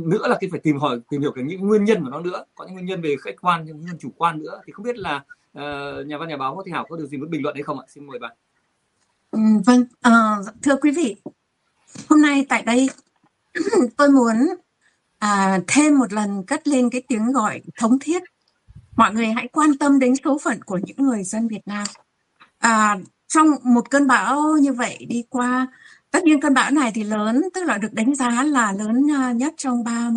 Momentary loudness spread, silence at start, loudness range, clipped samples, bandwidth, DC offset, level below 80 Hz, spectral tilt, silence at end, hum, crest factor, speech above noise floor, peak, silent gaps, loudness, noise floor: 14 LU; 0 s; 9 LU; under 0.1%; 11 kHz; under 0.1%; -64 dBFS; -4.5 dB/octave; 0 s; none; 18 dB; 49 dB; -2 dBFS; none; -19 LUFS; -69 dBFS